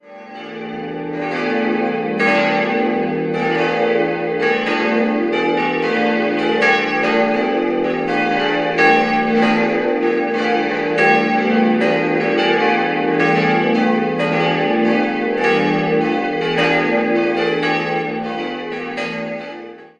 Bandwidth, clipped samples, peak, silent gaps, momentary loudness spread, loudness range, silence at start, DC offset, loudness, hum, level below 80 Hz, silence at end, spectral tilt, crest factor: 9.2 kHz; under 0.1%; 0 dBFS; none; 9 LU; 3 LU; 0.05 s; under 0.1%; -17 LUFS; none; -56 dBFS; 0.1 s; -6 dB/octave; 16 dB